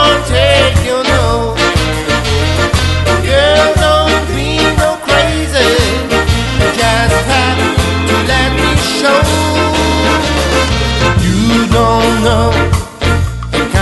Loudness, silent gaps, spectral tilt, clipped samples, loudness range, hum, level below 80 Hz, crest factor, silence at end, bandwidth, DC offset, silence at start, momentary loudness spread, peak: -11 LUFS; none; -4.5 dB/octave; under 0.1%; 1 LU; none; -20 dBFS; 10 dB; 0 s; 12.5 kHz; under 0.1%; 0 s; 4 LU; 0 dBFS